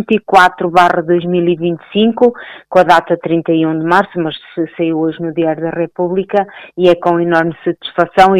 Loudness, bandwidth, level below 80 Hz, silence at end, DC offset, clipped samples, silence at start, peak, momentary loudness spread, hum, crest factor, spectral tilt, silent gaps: -13 LUFS; 12.5 kHz; -48 dBFS; 0 s; under 0.1%; 0.2%; 0 s; 0 dBFS; 9 LU; none; 12 dB; -6.5 dB/octave; none